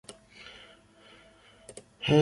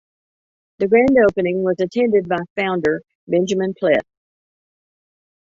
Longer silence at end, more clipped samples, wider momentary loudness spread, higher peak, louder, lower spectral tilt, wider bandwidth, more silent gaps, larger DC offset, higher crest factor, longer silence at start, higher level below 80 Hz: second, 0 s vs 1.5 s; neither; first, 21 LU vs 8 LU; second, -12 dBFS vs -2 dBFS; second, -30 LUFS vs -18 LUFS; about the same, -6 dB/octave vs -6.5 dB/octave; first, 11.5 kHz vs 7.6 kHz; second, none vs 2.50-2.56 s, 3.15-3.27 s; neither; about the same, 22 dB vs 18 dB; first, 2 s vs 0.8 s; second, -62 dBFS vs -54 dBFS